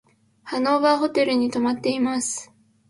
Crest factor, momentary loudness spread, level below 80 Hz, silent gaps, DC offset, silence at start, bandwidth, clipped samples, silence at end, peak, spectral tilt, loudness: 18 dB; 9 LU; -66 dBFS; none; under 0.1%; 0.45 s; 11.5 kHz; under 0.1%; 0.45 s; -4 dBFS; -3 dB/octave; -22 LUFS